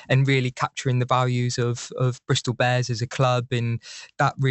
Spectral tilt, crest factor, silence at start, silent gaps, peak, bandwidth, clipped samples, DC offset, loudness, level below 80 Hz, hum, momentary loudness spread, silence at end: -5.5 dB/octave; 18 dB; 0.1 s; none; -6 dBFS; 8.2 kHz; under 0.1%; under 0.1%; -23 LUFS; -58 dBFS; none; 6 LU; 0 s